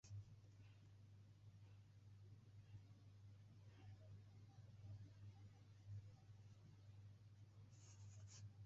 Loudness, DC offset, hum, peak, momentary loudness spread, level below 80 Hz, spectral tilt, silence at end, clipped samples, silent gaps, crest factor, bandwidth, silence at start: -65 LUFS; under 0.1%; none; -48 dBFS; 7 LU; -76 dBFS; -7 dB/octave; 0 s; under 0.1%; none; 14 dB; 7.6 kHz; 0.05 s